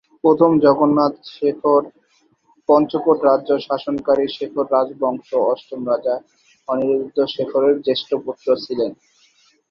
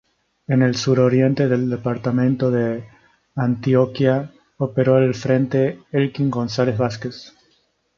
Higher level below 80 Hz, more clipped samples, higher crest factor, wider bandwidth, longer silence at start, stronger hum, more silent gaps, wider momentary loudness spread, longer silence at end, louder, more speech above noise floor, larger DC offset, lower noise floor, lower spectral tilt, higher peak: second, -62 dBFS vs -56 dBFS; neither; about the same, 16 dB vs 16 dB; about the same, 6.8 kHz vs 7.2 kHz; second, 0.25 s vs 0.5 s; neither; neither; about the same, 10 LU vs 11 LU; about the same, 0.8 s vs 0.7 s; about the same, -18 LUFS vs -19 LUFS; about the same, 43 dB vs 45 dB; neither; about the same, -60 dBFS vs -63 dBFS; about the same, -8 dB/octave vs -7.5 dB/octave; about the same, -2 dBFS vs -2 dBFS